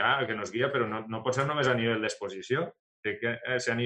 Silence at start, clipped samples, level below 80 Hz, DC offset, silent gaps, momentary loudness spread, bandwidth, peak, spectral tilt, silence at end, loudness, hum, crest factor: 0 s; under 0.1%; -72 dBFS; under 0.1%; 2.79-3.03 s; 8 LU; 10.5 kHz; -10 dBFS; -4.5 dB/octave; 0 s; -30 LUFS; none; 20 dB